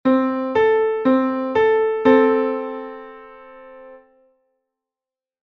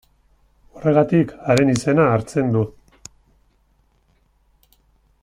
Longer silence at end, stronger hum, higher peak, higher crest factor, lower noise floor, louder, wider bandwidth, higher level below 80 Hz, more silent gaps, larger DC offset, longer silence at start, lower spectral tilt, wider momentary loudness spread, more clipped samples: second, 1.45 s vs 2.5 s; neither; about the same, -2 dBFS vs -2 dBFS; about the same, 18 dB vs 20 dB; first, under -90 dBFS vs -61 dBFS; about the same, -18 LUFS vs -18 LUFS; second, 6.2 kHz vs 15 kHz; second, -60 dBFS vs -52 dBFS; neither; neither; second, 0.05 s vs 0.75 s; about the same, -7 dB/octave vs -7 dB/octave; first, 17 LU vs 6 LU; neither